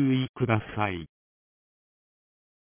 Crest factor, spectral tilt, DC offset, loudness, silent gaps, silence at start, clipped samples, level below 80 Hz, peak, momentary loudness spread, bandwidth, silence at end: 22 dB; -6 dB/octave; under 0.1%; -28 LUFS; 0.29-0.34 s; 0 s; under 0.1%; -56 dBFS; -8 dBFS; 12 LU; 3.6 kHz; 1.6 s